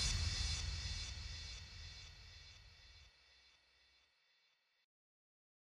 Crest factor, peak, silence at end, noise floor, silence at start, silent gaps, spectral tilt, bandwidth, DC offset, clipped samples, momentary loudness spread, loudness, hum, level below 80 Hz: 20 dB; -26 dBFS; 2.15 s; -79 dBFS; 0 s; none; -2 dB/octave; 13 kHz; under 0.1%; under 0.1%; 24 LU; -44 LUFS; none; -52 dBFS